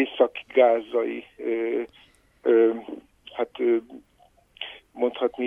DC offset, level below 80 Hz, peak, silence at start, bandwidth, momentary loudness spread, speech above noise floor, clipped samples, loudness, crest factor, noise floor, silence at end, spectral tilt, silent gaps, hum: under 0.1%; -68 dBFS; -6 dBFS; 0 s; 3.7 kHz; 18 LU; 37 dB; under 0.1%; -24 LUFS; 20 dB; -60 dBFS; 0 s; -6 dB/octave; none; none